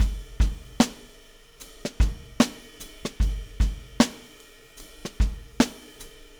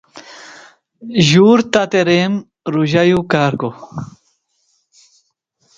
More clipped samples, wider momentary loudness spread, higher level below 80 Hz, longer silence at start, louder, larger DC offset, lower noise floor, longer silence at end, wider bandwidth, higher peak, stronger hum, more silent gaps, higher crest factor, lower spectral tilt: neither; second, 22 LU vs 25 LU; first, -30 dBFS vs -52 dBFS; second, 0 s vs 0.15 s; second, -27 LUFS vs -14 LUFS; neither; second, -51 dBFS vs -63 dBFS; second, 0.3 s vs 1.7 s; first, over 20 kHz vs 8.8 kHz; second, -4 dBFS vs 0 dBFS; neither; neither; first, 22 dB vs 16 dB; about the same, -5 dB/octave vs -5.5 dB/octave